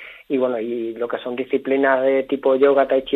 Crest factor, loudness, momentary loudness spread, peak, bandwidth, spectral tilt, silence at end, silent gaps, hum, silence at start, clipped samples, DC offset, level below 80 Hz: 16 dB; -20 LUFS; 10 LU; -2 dBFS; 4.1 kHz; -7.5 dB/octave; 0 s; none; none; 0 s; under 0.1%; under 0.1%; -62 dBFS